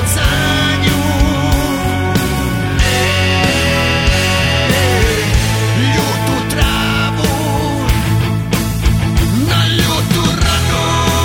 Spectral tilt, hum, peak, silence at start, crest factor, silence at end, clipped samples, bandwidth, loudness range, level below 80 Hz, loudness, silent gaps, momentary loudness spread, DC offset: -4.5 dB/octave; none; 0 dBFS; 0 s; 12 dB; 0 s; under 0.1%; 18 kHz; 2 LU; -20 dBFS; -13 LUFS; none; 4 LU; under 0.1%